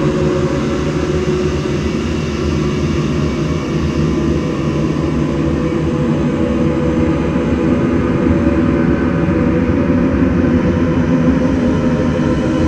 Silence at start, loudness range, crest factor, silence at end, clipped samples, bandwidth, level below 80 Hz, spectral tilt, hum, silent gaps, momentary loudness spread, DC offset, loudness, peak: 0 s; 3 LU; 14 dB; 0 s; under 0.1%; 9.4 kHz; -28 dBFS; -7.5 dB/octave; none; none; 4 LU; under 0.1%; -15 LUFS; 0 dBFS